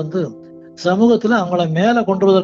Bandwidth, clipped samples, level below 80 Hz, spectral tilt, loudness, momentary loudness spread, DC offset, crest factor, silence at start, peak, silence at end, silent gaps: 7.6 kHz; under 0.1%; -58 dBFS; -7 dB/octave; -16 LUFS; 9 LU; under 0.1%; 12 dB; 0 s; -2 dBFS; 0 s; none